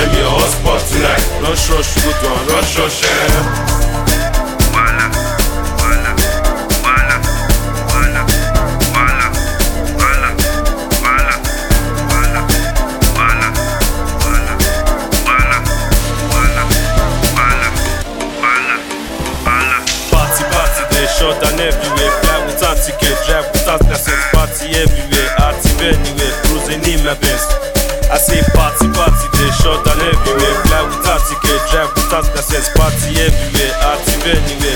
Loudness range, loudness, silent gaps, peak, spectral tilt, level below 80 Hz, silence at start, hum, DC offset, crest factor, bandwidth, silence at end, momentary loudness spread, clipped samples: 2 LU; -13 LUFS; none; 0 dBFS; -3.5 dB/octave; -16 dBFS; 0 s; none; under 0.1%; 12 dB; 19.5 kHz; 0 s; 4 LU; under 0.1%